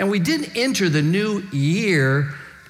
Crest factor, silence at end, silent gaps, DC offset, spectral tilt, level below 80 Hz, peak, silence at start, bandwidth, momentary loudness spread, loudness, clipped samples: 14 dB; 0.15 s; none; under 0.1%; -5.5 dB/octave; -62 dBFS; -6 dBFS; 0 s; 16 kHz; 5 LU; -20 LUFS; under 0.1%